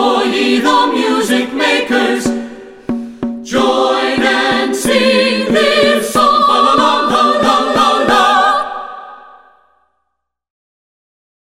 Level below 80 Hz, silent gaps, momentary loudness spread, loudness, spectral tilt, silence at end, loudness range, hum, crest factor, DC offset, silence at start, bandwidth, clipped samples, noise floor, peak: -48 dBFS; none; 13 LU; -12 LUFS; -3 dB/octave; 2.4 s; 5 LU; 60 Hz at -55 dBFS; 12 dB; under 0.1%; 0 s; 16.5 kHz; under 0.1%; -72 dBFS; 0 dBFS